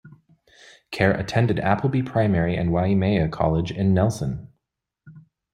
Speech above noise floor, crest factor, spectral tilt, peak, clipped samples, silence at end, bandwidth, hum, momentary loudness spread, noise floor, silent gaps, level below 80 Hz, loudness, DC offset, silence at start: 60 dB; 20 dB; -7.5 dB/octave; -4 dBFS; under 0.1%; 0.35 s; 13.5 kHz; none; 5 LU; -81 dBFS; none; -46 dBFS; -22 LUFS; under 0.1%; 0.05 s